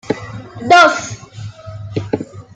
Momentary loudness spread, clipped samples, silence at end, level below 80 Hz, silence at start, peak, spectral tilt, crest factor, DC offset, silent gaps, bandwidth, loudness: 23 LU; under 0.1%; 0.15 s; -50 dBFS; 0.05 s; 0 dBFS; -4 dB/octave; 16 dB; under 0.1%; none; 9.2 kHz; -14 LUFS